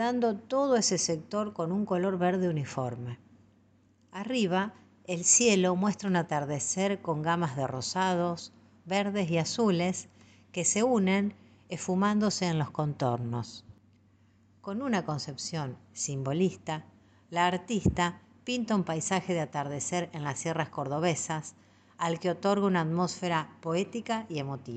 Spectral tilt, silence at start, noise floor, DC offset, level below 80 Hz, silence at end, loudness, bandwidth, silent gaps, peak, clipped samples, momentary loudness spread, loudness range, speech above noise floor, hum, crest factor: -4.5 dB/octave; 0 s; -64 dBFS; under 0.1%; -60 dBFS; 0 s; -30 LUFS; 9.4 kHz; none; -10 dBFS; under 0.1%; 12 LU; 6 LU; 35 dB; none; 20 dB